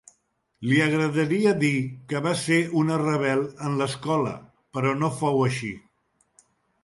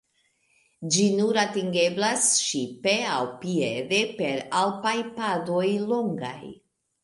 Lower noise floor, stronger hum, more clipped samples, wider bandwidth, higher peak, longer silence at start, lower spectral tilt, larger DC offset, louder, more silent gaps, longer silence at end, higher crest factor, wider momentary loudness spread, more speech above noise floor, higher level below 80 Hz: about the same, -69 dBFS vs -69 dBFS; neither; neither; about the same, 11.5 kHz vs 11.5 kHz; about the same, -8 dBFS vs -8 dBFS; second, 0.6 s vs 0.8 s; first, -6 dB/octave vs -3 dB/octave; neither; about the same, -24 LUFS vs -24 LUFS; neither; first, 1.05 s vs 0.5 s; about the same, 18 dB vs 18 dB; about the same, 10 LU vs 8 LU; about the same, 46 dB vs 44 dB; first, -64 dBFS vs -72 dBFS